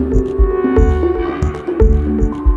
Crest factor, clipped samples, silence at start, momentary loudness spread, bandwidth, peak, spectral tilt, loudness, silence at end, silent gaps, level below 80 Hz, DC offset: 12 dB; under 0.1%; 0 s; 5 LU; 7.4 kHz; 0 dBFS; -9.5 dB/octave; -15 LUFS; 0 s; none; -16 dBFS; under 0.1%